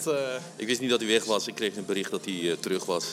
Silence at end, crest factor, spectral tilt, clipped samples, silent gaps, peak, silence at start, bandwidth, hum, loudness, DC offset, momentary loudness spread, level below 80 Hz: 0 s; 20 dB; -3 dB/octave; under 0.1%; none; -10 dBFS; 0 s; 16.5 kHz; none; -28 LUFS; under 0.1%; 7 LU; -82 dBFS